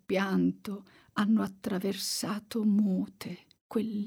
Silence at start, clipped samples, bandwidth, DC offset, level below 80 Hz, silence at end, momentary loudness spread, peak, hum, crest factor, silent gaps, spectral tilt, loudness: 0.1 s; under 0.1%; 18.5 kHz; under 0.1%; -72 dBFS; 0 s; 15 LU; -18 dBFS; none; 14 dB; 3.61-3.70 s; -5.5 dB/octave; -31 LUFS